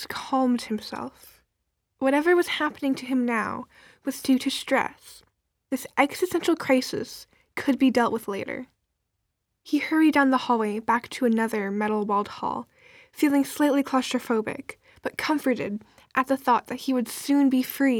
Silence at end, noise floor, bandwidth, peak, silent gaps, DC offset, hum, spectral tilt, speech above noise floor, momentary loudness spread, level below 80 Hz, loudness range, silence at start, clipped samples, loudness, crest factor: 0 s; -79 dBFS; 18.5 kHz; -6 dBFS; none; under 0.1%; none; -4 dB/octave; 54 dB; 13 LU; -66 dBFS; 3 LU; 0 s; under 0.1%; -25 LUFS; 20 dB